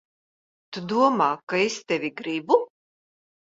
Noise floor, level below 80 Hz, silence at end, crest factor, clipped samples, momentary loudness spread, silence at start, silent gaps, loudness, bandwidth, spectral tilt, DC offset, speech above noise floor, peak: under -90 dBFS; -72 dBFS; 0.8 s; 22 dB; under 0.1%; 14 LU; 0.7 s; 1.43-1.47 s; -24 LUFS; 7.8 kHz; -4.5 dB/octave; under 0.1%; over 67 dB; -4 dBFS